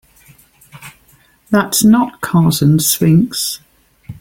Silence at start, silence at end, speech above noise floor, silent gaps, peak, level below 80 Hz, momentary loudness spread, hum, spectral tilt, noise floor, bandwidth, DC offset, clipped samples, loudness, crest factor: 0.75 s; 0.05 s; 39 dB; none; 0 dBFS; -48 dBFS; 8 LU; none; -5 dB/octave; -51 dBFS; 17 kHz; under 0.1%; under 0.1%; -13 LUFS; 14 dB